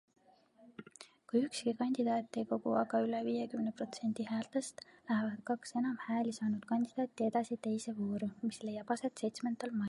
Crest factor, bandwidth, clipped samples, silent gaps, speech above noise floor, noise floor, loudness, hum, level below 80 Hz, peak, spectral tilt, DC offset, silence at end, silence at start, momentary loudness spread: 18 dB; 11.5 kHz; under 0.1%; none; 29 dB; -66 dBFS; -37 LUFS; none; -80 dBFS; -18 dBFS; -5.5 dB/octave; under 0.1%; 0 s; 0.6 s; 6 LU